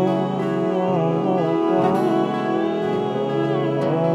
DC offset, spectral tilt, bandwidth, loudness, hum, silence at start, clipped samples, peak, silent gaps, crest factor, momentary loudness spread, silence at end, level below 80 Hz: under 0.1%; -8.5 dB/octave; 11 kHz; -21 LUFS; none; 0 s; under 0.1%; -6 dBFS; none; 12 dB; 4 LU; 0 s; -66 dBFS